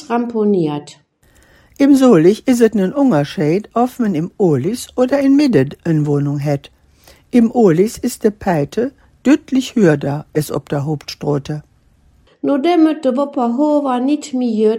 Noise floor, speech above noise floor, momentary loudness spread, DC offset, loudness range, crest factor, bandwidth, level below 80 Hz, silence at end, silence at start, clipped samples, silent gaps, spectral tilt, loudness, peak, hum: -52 dBFS; 38 dB; 9 LU; under 0.1%; 4 LU; 14 dB; 16 kHz; -50 dBFS; 0 s; 0 s; under 0.1%; none; -7 dB/octave; -15 LUFS; 0 dBFS; none